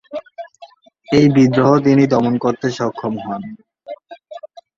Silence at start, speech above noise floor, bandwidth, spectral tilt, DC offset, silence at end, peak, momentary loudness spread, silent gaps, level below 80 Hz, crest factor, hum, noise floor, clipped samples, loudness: 0.1 s; 30 dB; 7.4 kHz; -7.5 dB/octave; under 0.1%; 0.3 s; -2 dBFS; 24 LU; none; -54 dBFS; 16 dB; none; -44 dBFS; under 0.1%; -15 LUFS